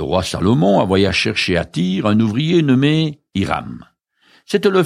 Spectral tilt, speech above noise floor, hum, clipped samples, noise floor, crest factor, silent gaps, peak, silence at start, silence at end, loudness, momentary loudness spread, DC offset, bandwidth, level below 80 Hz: -6 dB/octave; 39 dB; none; under 0.1%; -55 dBFS; 14 dB; none; -2 dBFS; 0 s; 0 s; -16 LUFS; 8 LU; under 0.1%; 15 kHz; -44 dBFS